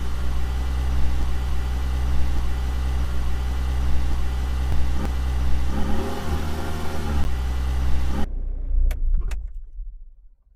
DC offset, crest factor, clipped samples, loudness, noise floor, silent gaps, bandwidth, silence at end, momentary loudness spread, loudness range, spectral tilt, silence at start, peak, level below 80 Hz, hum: under 0.1%; 12 dB; under 0.1%; -27 LUFS; -47 dBFS; none; 14 kHz; 0.3 s; 4 LU; 2 LU; -6.5 dB/octave; 0 s; -8 dBFS; -24 dBFS; none